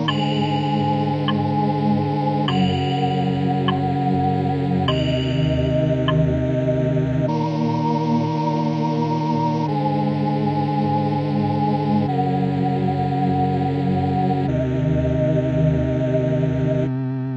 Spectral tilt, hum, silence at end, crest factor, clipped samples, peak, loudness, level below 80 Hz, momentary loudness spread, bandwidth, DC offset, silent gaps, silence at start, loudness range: -8.5 dB/octave; none; 0 s; 14 dB; under 0.1%; -4 dBFS; -20 LUFS; -42 dBFS; 2 LU; 7.6 kHz; under 0.1%; none; 0 s; 1 LU